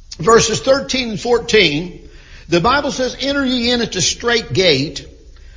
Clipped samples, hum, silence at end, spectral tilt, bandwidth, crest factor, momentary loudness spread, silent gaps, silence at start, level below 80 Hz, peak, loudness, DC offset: under 0.1%; none; 0.05 s; -3.5 dB/octave; 7.6 kHz; 16 dB; 8 LU; none; 0.1 s; -38 dBFS; 0 dBFS; -15 LUFS; under 0.1%